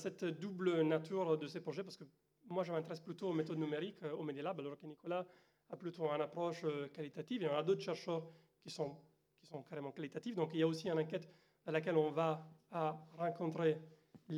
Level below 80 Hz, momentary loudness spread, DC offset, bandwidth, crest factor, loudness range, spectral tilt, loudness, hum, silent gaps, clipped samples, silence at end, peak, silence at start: under -90 dBFS; 13 LU; under 0.1%; 11.5 kHz; 20 dB; 4 LU; -7 dB/octave; -41 LUFS; none; none; under 0.1%; 0 s; -22 dBFS; 0 s